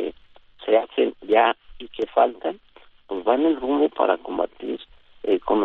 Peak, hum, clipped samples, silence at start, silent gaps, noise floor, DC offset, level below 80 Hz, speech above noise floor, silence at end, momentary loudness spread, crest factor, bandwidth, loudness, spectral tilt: -4 dBFS; none; under 0.1%; 0 s; none; -50 dBFS; under 0.1%; -56 dBFS; 28 dB; 0 s; 14 LU; 18 dB; 4.3 kHz; -23 LUFS; -7 dB/octave